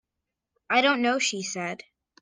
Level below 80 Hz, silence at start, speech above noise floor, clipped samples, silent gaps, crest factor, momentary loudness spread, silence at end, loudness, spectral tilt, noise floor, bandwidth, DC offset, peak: -76 dBFS; 0.7 s; 60 dB; under 0.1%; none; 20 dB; 12 LU; 0.45 s; -25 LUFS; -2.5 dB/octave; -85 dBFS; 10 kHz; under 0.1%; -8 dBFS